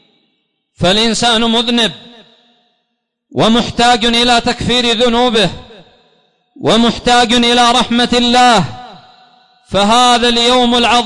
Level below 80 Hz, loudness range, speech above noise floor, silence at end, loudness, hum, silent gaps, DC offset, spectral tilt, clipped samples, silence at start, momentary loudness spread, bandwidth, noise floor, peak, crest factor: -36 dBFS; 3 LU; 59 dB; 0 s; -10 LUFS; none; none; under 0.1%; -3.5 dB/octave; under 0.1%; 0.8 s; 6 LU; 11 kHz; -69 dBFS; -2 dBFS; 10 dB